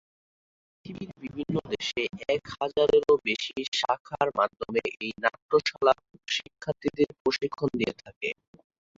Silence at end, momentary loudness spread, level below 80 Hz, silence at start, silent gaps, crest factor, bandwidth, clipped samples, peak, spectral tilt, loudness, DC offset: 0.65 s; 11 LU; -62 dBFS; 0.85 s; 3.68-3.72 s, 4.00-4.05 s, 5.42-5.49 s, 7.20-7.25 s, 8.16-8.21 s; 22 dB; 7.8 kHz; under 0.1%; -8 dBFS; -4.5 dB/octave; -28 LUFS; under 0.1%